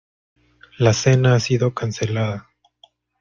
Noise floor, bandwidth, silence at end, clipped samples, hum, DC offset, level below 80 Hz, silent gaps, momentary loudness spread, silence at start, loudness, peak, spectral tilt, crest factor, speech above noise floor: -56 dBFS; 7.4 kHz; 0.8 s; under 0.1%; 60 Hz at -35 dBFS; under 0.1%; -52 dBFS; none; 9 LU; 0.8 s; -19 LUFS; -2 dBFS; -5.5 dB/octave; 18 dB; 38 dB